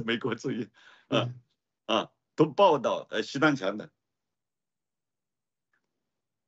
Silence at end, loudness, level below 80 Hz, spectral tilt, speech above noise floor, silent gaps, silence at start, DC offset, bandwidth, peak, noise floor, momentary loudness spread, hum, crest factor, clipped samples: 2.6 s; -28 LUFS; -76 dBFS; -5.5 dB/octave; over 62 dB; none; 0 s; under 0.1%; 8 kHz; -10 dBFS; under -90 dBFS; 16 LU; none; 20 dB; under 0.1%